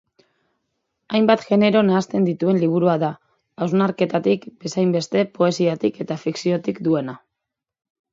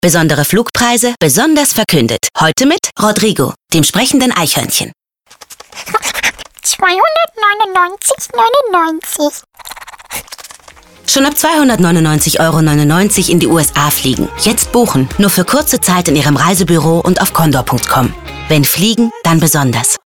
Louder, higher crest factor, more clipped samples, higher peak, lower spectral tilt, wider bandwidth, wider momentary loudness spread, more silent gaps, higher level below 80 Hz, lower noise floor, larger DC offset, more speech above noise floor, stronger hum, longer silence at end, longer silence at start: second, -20 LUFS vs -10 LUFS; first, 20 dB vs 12 dB; neither; about the same, 0 dBFS vs 0 dBFS; first, -6.5 dB/octave vs -4 dB/octave; second, 7.8 kHz vs 19.5 kHz; about the same, 8 LU vs 8 LU; neither; second, -66 dBFS vs -36 dBFS; first, -83 dBFS vs -41 dBFS; neither; first, 64 dB vs 31 dB; neither; first, 0.95 s vs 0.1 s; first, 1.1 s vs 0.05 s